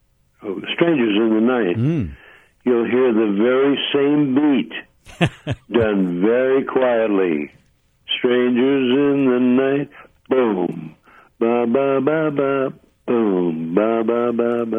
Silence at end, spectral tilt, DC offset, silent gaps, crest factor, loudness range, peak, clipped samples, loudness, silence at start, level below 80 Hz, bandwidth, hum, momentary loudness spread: 0 s; -8 dB/octave; under 0.1%; none; 16 dB; 2 LU; -2 dBFS; under 0.1%; -18 LUFS; 0.4 s; -52 dBFS; 10 kHz; none; 10 LU